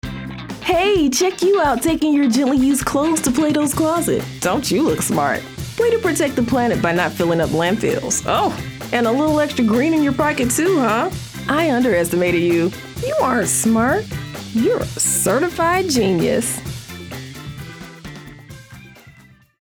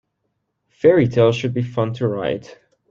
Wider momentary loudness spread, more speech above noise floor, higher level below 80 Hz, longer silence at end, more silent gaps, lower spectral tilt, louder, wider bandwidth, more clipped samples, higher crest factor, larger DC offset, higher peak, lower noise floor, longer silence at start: first, 14 LU vs 10 LU; second, 31 dB vs 56 dB; first, -42 dBFS vs -56 dBFS; first, 0.55 s vs 0.35 s; neither; second, -4.5 dB/octave vs -7.5 dB/octave; about the same, -17 LUFS vs -18 LUFS; first, over 20 kHz vs 7.4 kHz; neither; about the same, 14 dB vs 18 dB; neither; about the same, -4 dBFS vs -2 dBFS; second, -47 dBFS vs -73 dBFS; second, 0.05 s vs 0.85 s